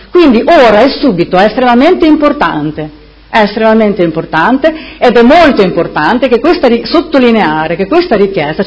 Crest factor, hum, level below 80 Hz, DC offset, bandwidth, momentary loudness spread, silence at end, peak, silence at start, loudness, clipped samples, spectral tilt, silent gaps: 8 dB; none; -36 dBFS; under 0.1%; 8 kHz; 7 LU; 0 s; 0 dBFS; 0.15 s; -7 LUFS; 3%; -7 dB/octave; none